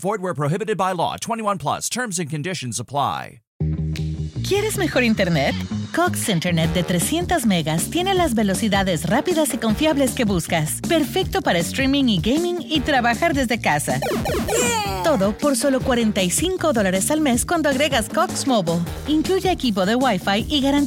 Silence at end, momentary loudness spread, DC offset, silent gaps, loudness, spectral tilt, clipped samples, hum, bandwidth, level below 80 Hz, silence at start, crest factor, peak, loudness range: 0 s; 6 LU; under 0.1%; 3.47-3.60 s; -20 LUFS; -4.5 dB/octave; under 0.1%; none; 17 kHz; -38 dBFS; 0 s; 14 dB; -6 dBFS; 4 LU